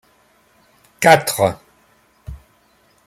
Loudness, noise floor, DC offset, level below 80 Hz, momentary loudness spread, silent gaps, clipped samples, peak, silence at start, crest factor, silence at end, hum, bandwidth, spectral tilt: -15 LUFS; -57 dBFS; under 0.1%; -46 dBFS; 26 LU; none; under 0.1%; 0 dBFS; 1 s; 20 dB; 0.7 s; none; 16 kHz; -3.5 dB/octave